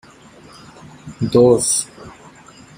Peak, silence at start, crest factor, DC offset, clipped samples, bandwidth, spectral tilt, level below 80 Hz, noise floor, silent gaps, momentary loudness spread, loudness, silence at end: -2 dBFS; 1.05 s; 18 dB; under 0.1%; under 0.1%; 16 kHz; -5 dB/octave; -50 dBFS; -44 dBFS; none; 25 LU; -15 LUFS; 0.65 s